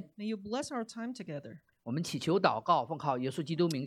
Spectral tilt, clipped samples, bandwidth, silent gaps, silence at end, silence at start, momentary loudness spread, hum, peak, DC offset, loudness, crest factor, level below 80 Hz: -5.5 dB/octave; under 0.1%; 15 kHz; none; 0 s; 0 s; 14 LU; none; -10 dBFS; under 0.1%; -34 LUFS; 22 dB; -74 dBFS